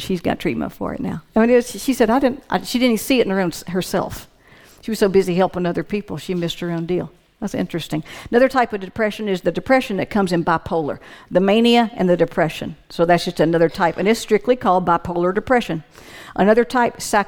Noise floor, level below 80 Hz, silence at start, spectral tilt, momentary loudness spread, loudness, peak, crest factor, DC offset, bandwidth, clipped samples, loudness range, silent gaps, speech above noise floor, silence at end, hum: -48 dBFS; -46 dBFS; 0 s; -5.5 dB/octave; 11 LU; -19 LUFS; -2 dBFS; 16 dB; under 0.1%; 19.5 kHz; under 0.1%; 4 LU; none; 29 dB; 0 s; none